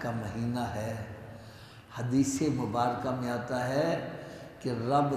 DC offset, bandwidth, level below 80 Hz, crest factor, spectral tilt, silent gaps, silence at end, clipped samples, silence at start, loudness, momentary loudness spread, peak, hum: under 0.1%; 14.5 kHz; -60 dBFS; 18 dB; -6 dB/octave; none; 0 s; under 0.1%; 0 s; -32 LUFS; 17 LU; -12 dBFS; none